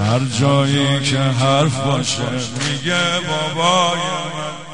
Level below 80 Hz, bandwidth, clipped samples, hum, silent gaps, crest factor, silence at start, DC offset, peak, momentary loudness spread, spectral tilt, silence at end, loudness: -50 dBFS; 10.5 kHz; under 0.1%; none; none; 16 dB; 0 s; 1%; -2 dBFS; 7 LU; -4.5 dB/octave; 0 s; -17 LUFS